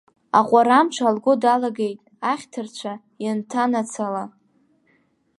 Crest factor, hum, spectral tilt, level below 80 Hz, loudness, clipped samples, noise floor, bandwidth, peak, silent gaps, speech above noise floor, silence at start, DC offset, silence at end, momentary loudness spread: 20 dB; none; -4.5 dB/octave; -74 dBFS; -21 LUFS; under 0.1%; -63 dBFS; 11.5 kHz; -2 dBFS; none; 43 dB; 0.35 s; under 0.1%; 1.1 s; 15 LU